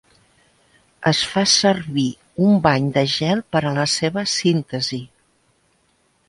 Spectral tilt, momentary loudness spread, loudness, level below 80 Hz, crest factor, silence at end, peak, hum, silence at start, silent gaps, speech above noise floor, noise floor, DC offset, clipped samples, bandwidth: -4 dB/octave; 9 LU; -19 LUFS; -54 dBFS; 20 dB; 1.2 s; -2 dBFS; none; 1 s; none; 44 dB; -63 dBFS; under 0.1%; under 0.1%; 11.5 kHz